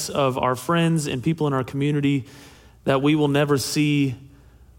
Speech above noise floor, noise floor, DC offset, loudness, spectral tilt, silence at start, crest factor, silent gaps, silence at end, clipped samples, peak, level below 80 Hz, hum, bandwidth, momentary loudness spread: 28 dB; -49 dBFS; under 0.1%; -22 LUFS; -5.5 dB/octave; 0 s; 16 dB; none; 0.5 s; under 0.1%; -6 dBFS; -54 dBFS; none; 17 kHz; 7 LU